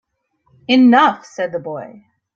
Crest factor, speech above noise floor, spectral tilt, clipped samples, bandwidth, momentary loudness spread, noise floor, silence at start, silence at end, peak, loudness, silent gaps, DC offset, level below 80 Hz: 16 dB; 49 dB; -5 dB/octave; under 0.1%; 7.2 kHz; 19 LU; -63 dBFS; 0.7 s; 0.5 s; -2 dBFS; -14 LUFS; none; under 0.1%; -64 dBFS